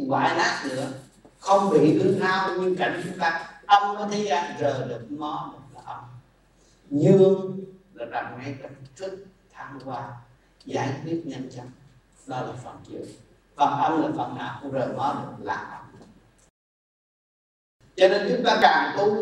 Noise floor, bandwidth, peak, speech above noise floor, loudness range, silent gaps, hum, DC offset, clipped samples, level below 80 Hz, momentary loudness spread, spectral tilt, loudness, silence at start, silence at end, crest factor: -59 dBFS; 11.5 kHz; -4 dBFS; 35 dB; 12 LU; 16.50-17.80 s; none; under 0.1%; under 0.1%; -64 dBFS; 21 LU; -5.5 dB/octave; -24 LUFS; 0 s; 0 s; 22 dB